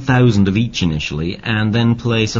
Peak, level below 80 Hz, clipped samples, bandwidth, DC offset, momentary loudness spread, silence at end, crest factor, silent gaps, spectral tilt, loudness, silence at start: -2 dBFS; -36 dBFS; under 0.1%; 7.6 kHz; under 0.1%; 7 LU; 0 s; 14 dB; none; -6 dB/octave; -16 LUFS; 0 s